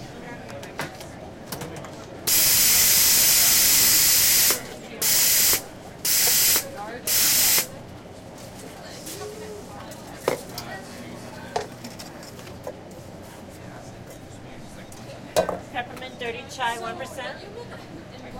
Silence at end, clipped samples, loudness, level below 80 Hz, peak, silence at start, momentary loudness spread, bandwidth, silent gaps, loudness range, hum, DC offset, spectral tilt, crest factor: 0 s; under 0.1%; -17 LUFS; -52 dBFS; -4 dBFS; 0 s; 26 LU; 16.5 kHz; none; 21 LU; none; under 0.1%; -0.5 dB/octave; 20 dB